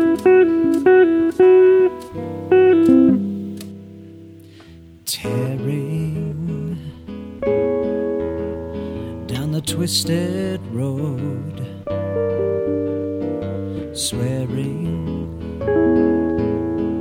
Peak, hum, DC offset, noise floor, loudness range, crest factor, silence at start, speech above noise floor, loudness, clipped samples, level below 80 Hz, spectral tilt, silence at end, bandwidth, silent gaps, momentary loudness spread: -2 dBFS; none; under 0.1%; -42 dBFS; 10 LU; 16 dB; 0 s; 26 dB; -19 LUFS; under 0.1%; -44 dBFS; -6 dB/octave; 0 s; 16.5 kHz; none; 16 LU